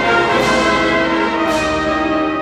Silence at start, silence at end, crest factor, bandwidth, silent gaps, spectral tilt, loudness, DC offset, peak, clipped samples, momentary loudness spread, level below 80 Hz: 0 s; 0 s; 12 dB; 15 kHz; none; -4.5 dB/octave; -15 LUFS; under 0.1%; -2 dBFS; under 0.1%; 3 LU; -38 dBFS